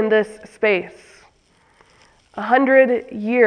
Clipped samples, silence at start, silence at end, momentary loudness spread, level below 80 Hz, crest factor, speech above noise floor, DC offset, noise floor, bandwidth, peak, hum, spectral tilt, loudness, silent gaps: under 0.1%; 0 s; 0 s; 16 LU; -62 dBFS; 18 dB; 40 dB; under 0.1%; -57 dBFS; 9.8 kHz; 0 dBFS; none; -6 dB/octave; -18 LUFS; none